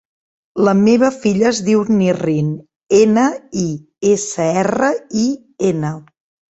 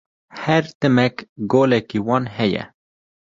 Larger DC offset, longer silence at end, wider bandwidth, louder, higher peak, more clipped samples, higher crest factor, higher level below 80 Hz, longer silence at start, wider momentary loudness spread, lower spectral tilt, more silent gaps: neither; second, 0.5 s vs 0.65 s; about the same, 8.2 kHz vs 7.6 kHz; first, -16 LUFS vs -19 LUFS; about the same, 0 dBFS vs -2 dBFS; neither; about the same, 16 dB vs 18 dB; about the same, -54 dBFS vs -56 dBFS; first, 0.55 s vs 0.35 s; about the same, 10 LU vs 12 LU; about the same, -6 dB/octave vs -7 dB/octave; second, 2.76-2.80 s vs 0.75-0.80 s, 1.29-1.36 s